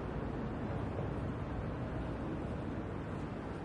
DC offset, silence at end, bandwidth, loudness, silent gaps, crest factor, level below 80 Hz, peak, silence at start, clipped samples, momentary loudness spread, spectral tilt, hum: under 0.1%; 0 s; 11 kHz; -40 LUFS; none; 12 dB; -48 dBFS; -26 dBFS; 0 s; under 0.1%; 2 LU; -8.5 dB/octave; none